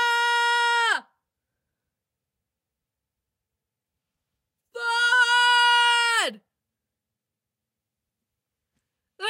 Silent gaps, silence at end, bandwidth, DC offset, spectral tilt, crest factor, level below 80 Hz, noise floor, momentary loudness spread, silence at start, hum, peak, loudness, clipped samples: none; 0 s; 16 kHz; under 0.1%; 2.5 dB/octave; 16 dB; under -90 dBFS; -86 dBFS; 10 LU; 0 s; none; -10 dBFS; -20 LUFS; under 0.1%